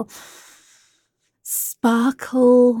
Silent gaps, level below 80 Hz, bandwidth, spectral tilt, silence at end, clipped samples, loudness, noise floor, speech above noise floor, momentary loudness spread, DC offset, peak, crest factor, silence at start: none; -70 dBFS; 17.5 kHz; -4 dB/octave; 0 s; under 0.1%; -18 LUFS; -69 dBFS; 52 dB; 23 LU; under 0.1%; -6 dBFS; 14 dB; 0 s